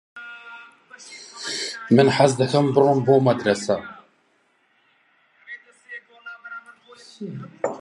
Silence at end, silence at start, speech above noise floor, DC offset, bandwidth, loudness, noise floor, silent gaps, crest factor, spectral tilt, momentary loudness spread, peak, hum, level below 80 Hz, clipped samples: 0 s; 0.15 s; 46 dB; under 0.1%; 11.5 kHz; -20 LUFS; -64 dBFS; none; 22 dB; -5.5 dB/octave; 23 LU; -2 dBFS; none; -66 dBFS; under 0.1%